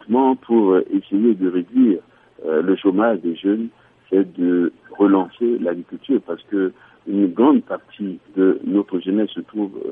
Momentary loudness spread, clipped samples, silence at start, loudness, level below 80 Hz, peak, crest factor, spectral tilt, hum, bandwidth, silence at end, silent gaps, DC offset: 10 LU; under 0.1%; 0.1 s; -19 LUFS; -72 dBFS; -2 dBFS; 16 dB; -10.5 dB/octave; none; 3.7 kHz; 0 s; none; under 0.1%